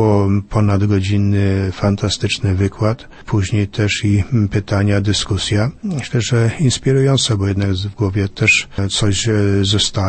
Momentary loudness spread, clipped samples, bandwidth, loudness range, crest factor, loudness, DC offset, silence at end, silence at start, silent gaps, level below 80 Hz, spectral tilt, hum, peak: 5 LU; under 0.1%; 8.8 kHz; 2 LU; 14 dB; -16 LUFS; under 0.1%; 0 s; 0 s; none; -38 dBFS; -5 dB/octave; none; -2 dBFS